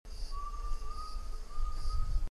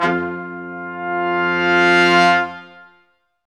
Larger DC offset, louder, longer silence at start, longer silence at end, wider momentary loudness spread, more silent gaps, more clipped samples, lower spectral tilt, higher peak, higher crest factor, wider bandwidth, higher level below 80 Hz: neither; second, -43 LUFS vs -16 LUFS; about the same, 0.05 s vs 0 s; second, 0.05 s vs 0.7 s; second, 7 LU vs 17 LU; neither; neither; about the same, -4.5 dB/octave vs -5 dB/octave; second, -20 dBFS vs 0 dBFS; about the same, 14 dB vs 18 dB; about the same, 11 kHz vs 11 kHz; first, -36 dBFS vs -60 dBFS